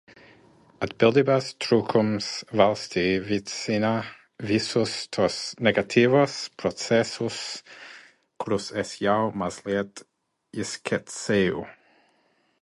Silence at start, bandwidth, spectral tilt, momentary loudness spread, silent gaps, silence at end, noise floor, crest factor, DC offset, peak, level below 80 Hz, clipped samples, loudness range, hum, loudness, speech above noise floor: 0.8 s; 11.5 kHz; -5 dB/octave; 14 LU; none; 0.9 s; -67 dBFS; 22 dB; under 0.1%; -4 dBFS; -58 dBFS; under 0.1%; 6 LU; none; -25 LUFS; 42 dB